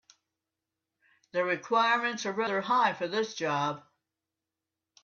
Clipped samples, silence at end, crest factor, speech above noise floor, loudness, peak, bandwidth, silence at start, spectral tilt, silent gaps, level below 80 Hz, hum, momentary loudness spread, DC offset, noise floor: under 0.1%; 1.25 s; 18 dB; 60 dB; -29 LUFS; -14 dBFS; 7.4 kHz; 1.35 s; -4 dB/octave; none; -82 dBFS; none; 7 LU; under 0.1%; -89 dBFS